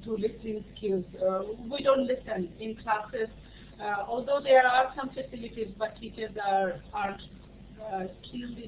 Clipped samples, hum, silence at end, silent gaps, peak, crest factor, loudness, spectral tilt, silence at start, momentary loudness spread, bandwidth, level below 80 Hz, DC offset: under 0.1%; none; 0 s; none; -8 dBFS; 22 dB; -30 LUFS; -3 dB/octave; 0 s; 14 LU; 4 kHz; -54 dBFS; under 0.1%